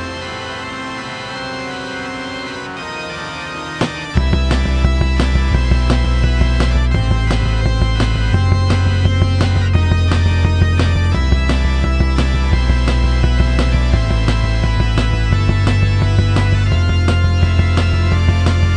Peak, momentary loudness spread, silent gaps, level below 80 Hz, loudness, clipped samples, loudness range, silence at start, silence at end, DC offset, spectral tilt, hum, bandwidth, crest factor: 0 dBFS; 10 LU; none; -18 dBFS; -16 LUFS; under 0.1%; 6 LU; 0 s; 0 s; under 0.1%; -6.5 dB/octave; none; 10 kHz; 14 dB